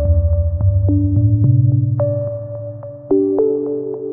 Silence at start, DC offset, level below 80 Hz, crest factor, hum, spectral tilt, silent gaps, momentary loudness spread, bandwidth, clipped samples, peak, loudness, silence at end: 0 s; under 0.1%; -26 dBFS; 12 dB; none; -17.5 dB/octave; none; 13 LU; 1.7 kHz; under 0.1%; -4 dBFS; -16 LUFS; 0 s